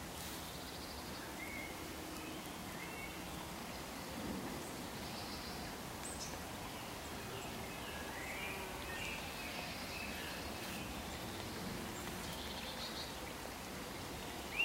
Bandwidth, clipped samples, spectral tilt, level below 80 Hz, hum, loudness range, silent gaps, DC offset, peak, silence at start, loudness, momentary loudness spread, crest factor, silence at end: 16 kHz; under 0.1%; -3 dB/octave; -58 dBFS; none; 2 LU; none; under 0.1%; -26 dBFS; 0 s; -45 LUFS; 3 LU; 20 dB; 0 s